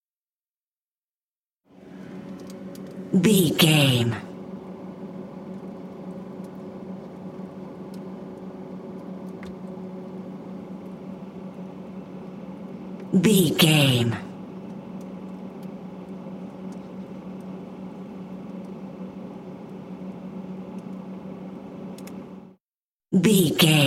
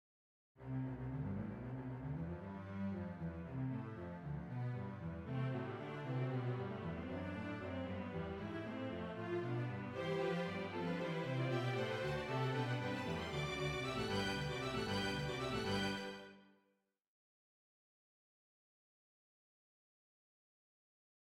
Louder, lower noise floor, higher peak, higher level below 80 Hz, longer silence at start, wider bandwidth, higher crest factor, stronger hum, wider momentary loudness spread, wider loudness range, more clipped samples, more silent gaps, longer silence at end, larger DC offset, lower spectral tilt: first, -22 LUFS vs -43 LUFS; first, under -90 dBFS vs -82 dBFS; first, -4 dBFS vs -26 dBFS; about the same, -64 dBFS vs -62 dBFS; first, 1.75 s vs 0.55 s; first, 16.5 kHz vs 14 kHz; first, 24 dB vs 16 dB; neither; first, 20 LU vs 8 LU; first, 15 LU vs 6 LU; neither; first, 22.61-22.68 s, 22.80-22.97 s vs none; second, 0 s vs 4.9 s; neither; about the same, -5 dB/octave vs -6 dB/octave